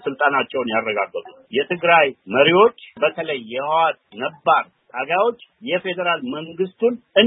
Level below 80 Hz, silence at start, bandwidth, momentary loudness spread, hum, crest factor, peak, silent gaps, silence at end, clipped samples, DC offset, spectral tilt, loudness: -70 dBFS; 0 s; 3.9 kHz; 12 LU; none; 20 dB; 0 dBFS; none; 0 s; under 0.1%; under 0.1%; -9.5 dB/octave; -20 LUFS